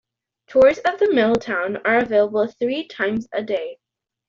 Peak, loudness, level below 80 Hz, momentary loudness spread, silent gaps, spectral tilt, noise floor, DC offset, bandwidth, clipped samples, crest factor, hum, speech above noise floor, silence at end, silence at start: -4 dBFS; -20 LUFS; -58 dBFS; 10 LU; none; -5.5 dB/octave; -51 dBFS; under 0.1%; 7.4 kHz; under 0.1%; 16 dB; none; 32 dB; 0.55 s; 0.5 s